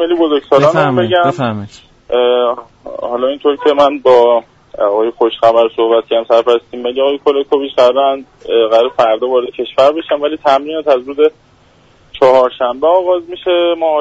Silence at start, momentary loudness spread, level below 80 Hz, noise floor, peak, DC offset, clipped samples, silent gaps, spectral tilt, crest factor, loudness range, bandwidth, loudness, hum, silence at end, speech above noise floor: 0 s; 8 LU; -52 dBFS; -47 dBFS; 0 dBFS; under 0.1%; under 0.1%; none; -6 dB/octave; 12 dB; 2 LU; 8 kHz; -12 LUFS; none; 0 s; 36 dB